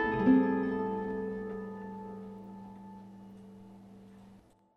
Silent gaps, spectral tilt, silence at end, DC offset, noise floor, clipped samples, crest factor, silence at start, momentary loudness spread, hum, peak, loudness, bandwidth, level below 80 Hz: none; -9 dB/octave; 0.4 s; under 0.1%; -59 dBFS; under 0.1%; 20 dB; 0 s; 27 LU; none; -14 dBFS; -32 LUFS; 5.2 kHz; -60 dBFS